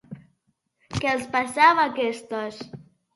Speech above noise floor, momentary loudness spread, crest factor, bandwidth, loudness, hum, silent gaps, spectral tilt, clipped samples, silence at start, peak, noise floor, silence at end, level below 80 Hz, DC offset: 49 dB; 17 LU; 22 dB; 11.5 kHz; -22 LUFS; none; none; -4.5 dB/octave; under 0.1%; 0.1 s; -4 dBFS; -72 dBFS; 0.35 s; -56 dBFS; under 0.1%